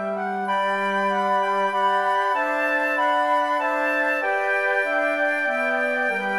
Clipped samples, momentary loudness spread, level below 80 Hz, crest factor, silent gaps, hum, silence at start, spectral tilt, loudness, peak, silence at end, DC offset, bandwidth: under 0.1%; 2 LU; -76 dBFS; 12 dB; none; none; 0 s; -4.5 dB/octave; -22 LUFS; -10 dBFS; 0 s; 0.1%; 14 kHz